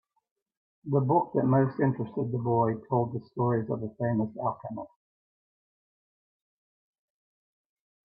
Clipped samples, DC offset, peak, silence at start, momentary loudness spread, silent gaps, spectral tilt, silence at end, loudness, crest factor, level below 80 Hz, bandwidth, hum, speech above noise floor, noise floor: under 0.1%; under 0.1%; -12 dBFS; 0.85 s; 12 LU; none; -13.5 dB/octave; 3.3 s; -28 LUFS; 18 dB; -70 dBFS; 4.7 kHz; none; over 62 dB; under -90 dBFS